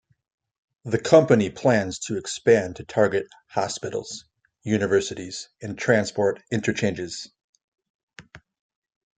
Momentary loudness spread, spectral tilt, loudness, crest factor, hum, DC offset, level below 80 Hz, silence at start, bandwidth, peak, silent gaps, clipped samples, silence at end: 17 LU; -5 dB/octave; -23 LUFS; 22 dB; none; under 0.1%; -62 dBFS; 0.85 s; 9.4 kHz; -2 dBFS; 7.44-7.53 s, 7.64-7.72 s, 7.90-8.08 s; under 0.1%; 0.8 s